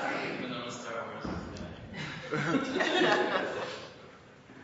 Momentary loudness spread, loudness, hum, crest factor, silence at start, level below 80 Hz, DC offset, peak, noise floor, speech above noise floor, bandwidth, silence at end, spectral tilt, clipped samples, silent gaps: 17 LU; -32 LUFS; none; 24 dB; 0 s; -60 dBFS; under 0.1%; -10 dBFS; -53 dBFS; 25 dB; 7.6 kHz; 0 s; -3 dB/octave; under 0.1%; none